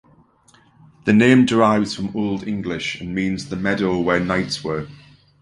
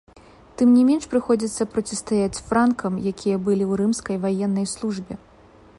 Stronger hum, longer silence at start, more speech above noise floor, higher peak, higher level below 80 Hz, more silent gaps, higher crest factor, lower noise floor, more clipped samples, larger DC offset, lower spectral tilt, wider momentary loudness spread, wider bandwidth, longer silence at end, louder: neither; first, 1.05 s vs 0.6 s; first, 36 dB vs 29 dB; first, -2 dBFS vs -8 dBFS; about the same, -48 dBFS vs -52 dBFS; neither; about the same, 18 dB vs 14 dB; first, -55 dBFS vs -50 dBFS; neither; neither; about the same, -6 dB/octave vs -6 dB/octave; about the same, 12 LU vs 10 LU; about the same, 11 kHz vs 11.5 kHz; second, 0.45 s vs 0.6 s; first, -19 LUFS vs -22 LUFS